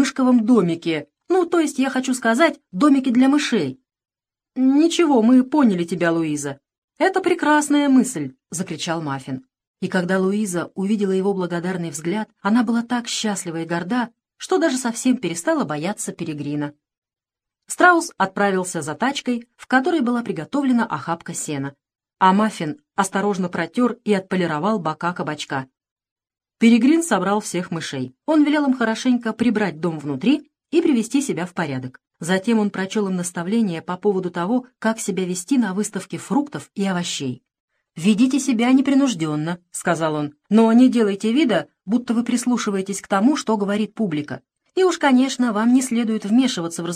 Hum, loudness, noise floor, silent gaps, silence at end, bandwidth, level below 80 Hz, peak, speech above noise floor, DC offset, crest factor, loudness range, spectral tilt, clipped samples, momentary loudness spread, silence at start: none; -20 LUFS; -89 dBFS; 6.78-6.88 s, 9.67-9.74 s, 16.98-17.02 s, 25.91-25.96 s, 26.11-26.16 s, 37.60-37.68 s; 0 s; 14.5 kHz; -68 dBFS; 0 dBFS; 69 dB; under 0.1%; 20 dB; 5 LU; -5 dB/octave; under 0.1%; 11 LU; 0 s